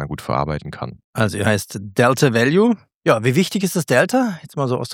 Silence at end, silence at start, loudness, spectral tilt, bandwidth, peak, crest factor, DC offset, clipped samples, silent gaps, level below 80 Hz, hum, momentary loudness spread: 0 s; 0 s; -18 LUFS; -5.5 dB/octave; 17.5 kHz; 0 dBFS; 18 dB; under 0.1%; under 0.1%; 1.04-1.13 s, 2.94-3.01 s; -48 dBFS; none; 10 LU